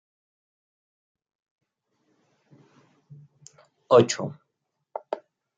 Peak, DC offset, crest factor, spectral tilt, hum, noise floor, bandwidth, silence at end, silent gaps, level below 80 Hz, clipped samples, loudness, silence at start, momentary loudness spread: -4 dBFS; under 0.1%; 26 dB; -5 dB/octave; none; -80 dBFS; 9 kHz; 0.4 s; none; -74 dBFS; under 0.1%; -24 LUFS; 3.9 s; 21 LU